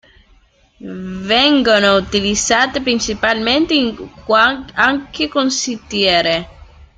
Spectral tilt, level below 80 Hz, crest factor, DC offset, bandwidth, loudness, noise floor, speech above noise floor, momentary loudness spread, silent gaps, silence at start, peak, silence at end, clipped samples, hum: -2.5 dB/octave; -42 dBFS; 16 dB; under 0.1%; 9.4 kHz; -14 LUFS; -52 dBFS; 36 dB; 10 LU; none; 0.8 s; 0 dBFS; 0.35 s; under 0.1%; none